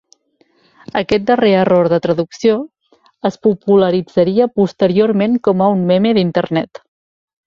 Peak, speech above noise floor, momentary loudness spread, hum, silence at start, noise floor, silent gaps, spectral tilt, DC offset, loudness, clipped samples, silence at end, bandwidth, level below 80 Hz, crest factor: -2 dBFS; 44 dB; 9 LU; none; 0.95 s; -57 dBFS; none; -7.5 dB/octave; under 0.1%; -14 LUFS; under 0.1%; 0.8 s; 7.4 kHz; -52 dBFS; 14 dB